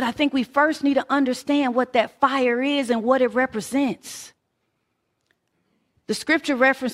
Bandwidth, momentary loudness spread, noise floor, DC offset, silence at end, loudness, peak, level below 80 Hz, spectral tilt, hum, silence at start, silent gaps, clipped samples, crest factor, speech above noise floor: 15 kHz; 7 LU; -74 dBFS; under 0.1%; 0 s; -21 LUFS; -4 dBFS; -64 dBFS; -4 dB/octave; none; 0 s; none; under 0.1%; 18 dB; 53 dB